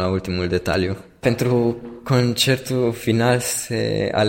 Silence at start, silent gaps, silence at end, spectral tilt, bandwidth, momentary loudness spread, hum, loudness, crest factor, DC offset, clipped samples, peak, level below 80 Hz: 0 s; none; 0 s; -5 dB/octave; 16.5 kHz; 5 LU; none; -20 LUFS; 16 dB; under 0.1%; under 0.1%; -4 dBFS; -46 dBFS